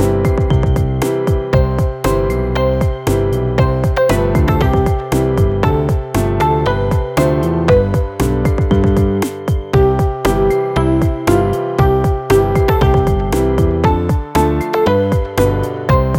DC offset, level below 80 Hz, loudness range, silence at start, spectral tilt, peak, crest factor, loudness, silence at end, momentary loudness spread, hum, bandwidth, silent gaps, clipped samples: under 0.1%; -22 dBFS; 1 LU; 0 s; -7.5 dB/octave; 0 dBFS; 12 dB; -15 LUFS; 0 s; 4 LU; none; 17.5 kHz; none; under 0.1%